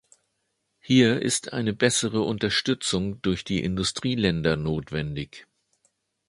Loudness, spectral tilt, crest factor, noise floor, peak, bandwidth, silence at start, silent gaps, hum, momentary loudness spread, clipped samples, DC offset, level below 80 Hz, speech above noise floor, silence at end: -25 LUFS; -4.5 dB/octave; 22 dB; -76 dBFS; -4 dBFS; 11.5 kHz; 0.85 s; none; none; 9 LU; under 0.1%; under 0.1%; -48 dBFS; 51 dB; 0.85 s